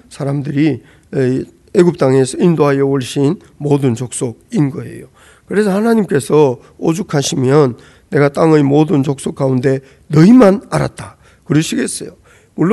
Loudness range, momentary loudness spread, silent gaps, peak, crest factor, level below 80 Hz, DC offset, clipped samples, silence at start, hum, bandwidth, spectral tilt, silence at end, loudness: 4 LU; 11 LU; none; 0 dBFS; 14 dB; -48 dBFS; under 0.1%; 0.2%; 0.1 s; none; 12.5 kHz; -6.5 dB/octave; 0 s; -14 LUFS